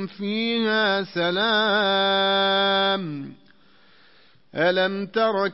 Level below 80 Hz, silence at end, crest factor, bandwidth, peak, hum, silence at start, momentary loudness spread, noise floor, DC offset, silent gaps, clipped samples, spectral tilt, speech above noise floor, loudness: -72 dBFS; 0 s; 14 dB; 5.8 kHz; -8 dBFS; none; 0 s; 8 LU; -57 dBFS; 0.2%; none; under 0.1%; -8 dB/octave; 35 dB; -21 LUFS